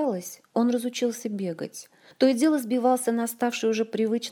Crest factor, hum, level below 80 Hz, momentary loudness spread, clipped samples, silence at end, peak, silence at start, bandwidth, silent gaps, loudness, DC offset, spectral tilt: 18 dB; none; -82 dBFS; 10 LU; under 0.1%; 0 s; -8 dBFS; 0 s; 20 kHz; none; -26 LUFS; under 0.1%; -4.5 dB/octave